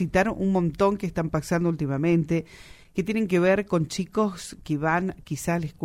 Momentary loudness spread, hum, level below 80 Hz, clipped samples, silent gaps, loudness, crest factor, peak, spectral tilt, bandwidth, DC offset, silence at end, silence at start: 9 LU; none; -48 dBFS; under 0.1%; none; -25 LUFS; 18 dB; -6 dBFS; -6.5 dB/octave; 15.5 kHz; under 0.1%; 0 s; 0 s